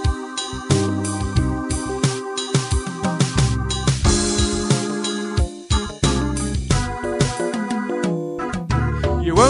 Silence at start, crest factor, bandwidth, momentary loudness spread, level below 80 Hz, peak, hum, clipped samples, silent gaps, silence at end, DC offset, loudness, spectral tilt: 0 s; 18 dB; 11.5 kHz; 6 LU; -28 dBFS; -2 dBFS; none; under 0.1%; none; 0 s; under 0.1%; -21 LUFS; -5 dB/octave